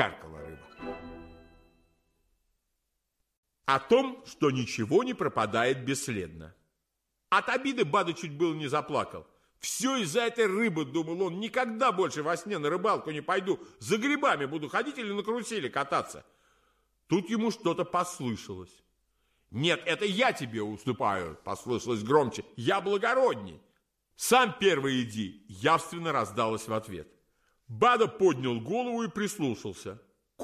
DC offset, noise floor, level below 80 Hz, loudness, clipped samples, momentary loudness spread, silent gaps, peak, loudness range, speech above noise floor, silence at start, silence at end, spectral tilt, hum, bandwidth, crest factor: under 0.1%; -82 dBFS; -64 dBFS; -29 LUFS; under 0.1%; 14 LU; 3.37-3.43 s; -8 dBFS; 4 LU; 53 dB; 0 s; 0 s; -4.5 dB/octave; none; 15.5 kHz; 22 dB